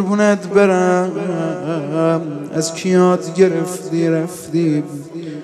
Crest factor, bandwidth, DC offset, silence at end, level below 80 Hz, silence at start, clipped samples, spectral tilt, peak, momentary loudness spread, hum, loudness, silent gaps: 16 dB; 13.5 kHz; under 0.1%; 0 s; -64 dBFS; 0 s; under 0.1%; -6 dB/octave; 0 dBFS; 8 LU; none; -17 LUFS; none